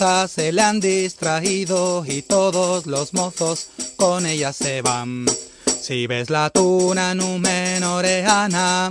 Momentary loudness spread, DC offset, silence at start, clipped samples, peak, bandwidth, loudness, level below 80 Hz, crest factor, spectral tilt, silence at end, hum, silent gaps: 6 LU; under 0.1%; 0 s; under 0.1%; -2 dBFS; 10.5 kHz; -19 LUFS; -56 dBFS; 16 dB; -3.5 dB/octave; 0 s; none; none